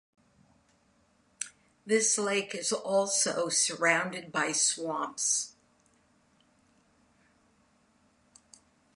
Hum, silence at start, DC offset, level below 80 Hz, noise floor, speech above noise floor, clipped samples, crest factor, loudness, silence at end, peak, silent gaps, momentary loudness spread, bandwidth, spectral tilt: none; 1.4 s; under 0.1%; -78 dBFS; -68 dBFS; 39 dB; under 0.1%; 22 dB; -28 LUFS; 3.45 s; -10 dBFS; none; 14 LU; 11.5 kHz; -1 dB/octave